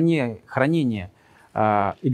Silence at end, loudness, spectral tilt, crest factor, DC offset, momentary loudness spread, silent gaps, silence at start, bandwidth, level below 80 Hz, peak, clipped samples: 0 s; -23 LUFS; -8 dB/octave; 18 dB; under 0.1%; 11 LU; none; 0 s; 10 kHz; -60 dBFS; -4 dBFS; under 0.1%